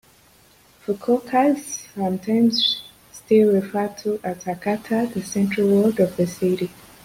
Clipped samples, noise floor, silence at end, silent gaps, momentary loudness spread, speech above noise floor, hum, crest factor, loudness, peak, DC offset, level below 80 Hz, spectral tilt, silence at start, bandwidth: under 0.1%; -54 dBFS; 0.35 s; none; 11 LU; 33 dB; none; 16 dB; -21 LUFS; -6 dBFS; under 0.1%; -60 dBFS; -5 dB/octave; 0.9 s; 16.5 kHz